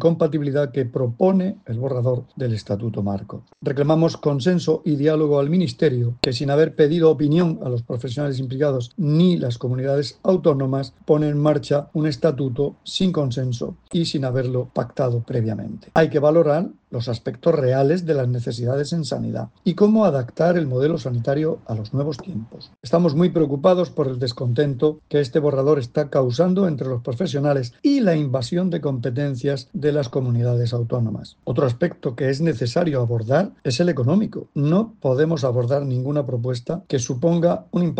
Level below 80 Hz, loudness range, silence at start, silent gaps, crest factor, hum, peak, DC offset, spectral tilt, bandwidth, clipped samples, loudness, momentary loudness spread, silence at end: -54 dBFS; 3 LU; 0 s; none; 18 dB; none; -2 dBFS; under 0.1%; -7.5 dB/octave; 9 kHz; under 0.1%; -21 LUFS; 8 LU; 0 s